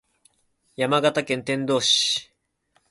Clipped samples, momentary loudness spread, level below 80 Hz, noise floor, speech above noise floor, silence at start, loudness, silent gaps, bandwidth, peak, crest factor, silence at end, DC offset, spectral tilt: under 0.1%; 8 LU; -68 dBFS; -68 dBFS; 46 dB; 0.8 s; -22 LUFS; none; 11.5 kHz; -8 dBFS; 18 dB; 0.65 s; under 0.1%; -3 dB/octave